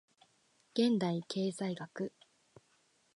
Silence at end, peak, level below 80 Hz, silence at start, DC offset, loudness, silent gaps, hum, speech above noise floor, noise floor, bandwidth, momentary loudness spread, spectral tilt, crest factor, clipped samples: 1.05 s; -18 dBFS; -84 dBFS; 0.75 s; under 0.1%; -36 LUFS; none; none; 39 dB; -73 dBFS; 11 kHz; 12 LU; -6 dB/octave; 20 dB; under 0.1%